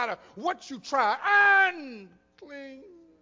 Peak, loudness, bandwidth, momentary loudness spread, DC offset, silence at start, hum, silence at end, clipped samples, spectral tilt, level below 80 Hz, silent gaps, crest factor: -10 dBFS; -23 LUFS; 7.6 kHz; 25 LU; under 0.1%; 0 s; none; 0.45 s; under 0.1%; -2.5 dB/octave; -74 dBFS; none; 16 dB